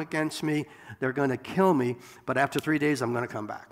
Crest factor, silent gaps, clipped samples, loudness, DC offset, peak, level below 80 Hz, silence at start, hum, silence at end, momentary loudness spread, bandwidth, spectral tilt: 18 dB; none; under 0.1%; -28 LUFS; under 0.1%; -10 dBFS; -68 dBFS; 0 s; none; 0.05 s; 10 LU; 16 kHz; -6 dB/octave